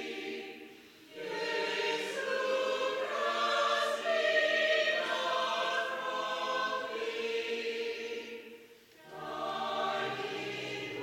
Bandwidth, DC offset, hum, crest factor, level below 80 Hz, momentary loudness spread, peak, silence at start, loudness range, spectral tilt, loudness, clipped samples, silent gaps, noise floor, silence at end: 17 kHz; under 0.1%; none; 18 dB; -80 dBFS; 15 LU; -16 dBFS; 0 s; 7 LU; -2 dB/octave; -33 LUFS; under 0.1%; none; -57 dBFS; 0 s